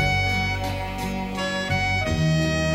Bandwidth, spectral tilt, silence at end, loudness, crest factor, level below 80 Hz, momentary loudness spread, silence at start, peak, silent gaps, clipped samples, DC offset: 16 kHz; -5 dB/octave; 0 s; -24 LUFS; 14 dB; -36 dBFS; 7 LU; 0 s; -8 dBFS; none; under 0.1%; under 0.1%